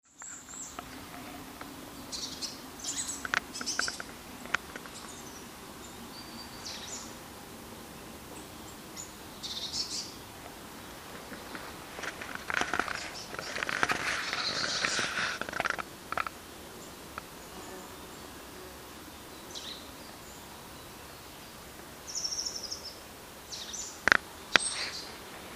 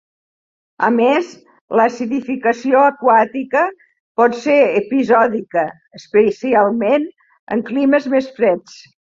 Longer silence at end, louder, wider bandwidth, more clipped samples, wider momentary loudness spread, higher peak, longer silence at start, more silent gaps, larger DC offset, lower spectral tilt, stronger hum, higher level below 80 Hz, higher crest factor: second, 0 s vs 0.4 s; second, -35 LUFS vs -16 LUFS; first, 16 kHz vs 7.6 kHz; neither; first, 16 LU vs 8 LU; about the same, 0 dBFS vs -2 dBFS; second, 0.05 s vs 0.8 s; second, none vs 1.61-1.68 s, 4.00-4.15 s, 7.39-7.47 s; neither; second, -1 dB/octave vs -6 dB/octave; neither; about the same, -60 dBFS vs -62 dBFS; first, 38 dB vs 14 dB